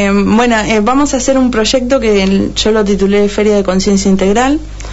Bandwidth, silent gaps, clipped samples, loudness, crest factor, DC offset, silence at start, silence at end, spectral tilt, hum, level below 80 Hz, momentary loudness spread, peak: 8 kHz; none; under 0.1%; -11 LUFS; 8 dB; under 0.1%; 0 s; 0 s; -5 dB/octave; none; -28 dBFS; 2 LU; -2 dBFS